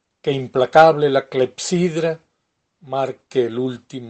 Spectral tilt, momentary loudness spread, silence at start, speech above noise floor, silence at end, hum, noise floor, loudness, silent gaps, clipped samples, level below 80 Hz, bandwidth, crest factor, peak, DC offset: -5.5 dB/octave; 13 LU; 0.25 s; 54 dB; 0 s; none; -72 dBFS; -18 LUFS; none; under 0.1%; -60 dBFS; 8.8 kHz; 18 dB; 0 dBFS; under 0.1%